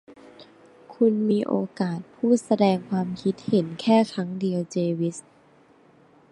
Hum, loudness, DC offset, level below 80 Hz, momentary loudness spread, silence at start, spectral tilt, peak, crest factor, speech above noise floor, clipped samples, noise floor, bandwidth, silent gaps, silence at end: none; -24 LUFS; under 0.1%; -68 dBFS; 8 LU; 0.1 s; -7 dB/octave; -6 dBFS; 18 dB; 33 dB; under 0.1%; -56 dBFS; 11 kHz; none; 1.1 s